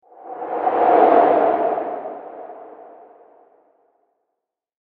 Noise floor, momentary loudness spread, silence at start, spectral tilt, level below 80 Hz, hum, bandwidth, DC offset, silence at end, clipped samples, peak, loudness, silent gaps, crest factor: -80 dBFS; 24 LU; 0.2 s; -8.5 dB/octave; -70 dBFS; none; 4.5 kHz; under 0.1%; 2.05 s; under 0.1%; -2 dBFS; -17 LUFS; none; 18 dB